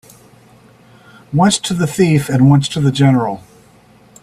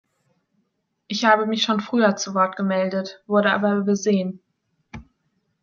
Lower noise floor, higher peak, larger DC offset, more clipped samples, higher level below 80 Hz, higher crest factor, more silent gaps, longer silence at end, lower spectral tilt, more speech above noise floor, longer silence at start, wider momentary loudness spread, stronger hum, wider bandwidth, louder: second, -46 dBFS vs -72 dBFS; about the same, 0 dBFS vs -2 dBFS; neither; neither; first, -50 dBFS vs -60 dBFS; second, 14 dB vs 20 dB; neither; first, 0.85 s vs 0.6 s; first, -6 dB/octave vs -4.5 dB/octave; second, 34 dB vs 52 dB; first, 1.3 s vs 1.1 s; about the same, 9 LU vs 7 LU; neither; first, 14 kHz vs 7.2 kHz; first, -14 LUFS vs -21 LUFS